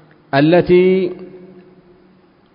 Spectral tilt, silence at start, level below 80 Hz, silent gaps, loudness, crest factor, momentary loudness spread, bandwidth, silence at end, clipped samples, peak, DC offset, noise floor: -12.5 dB/octave; 0.35 s; -48 dBFS; none; -13 LUFS; 16 dB; 12 LU; 5.4 kHz; 1.2 s; under 0.1%; 0 dBFS; under 0.1%; -50 dBFS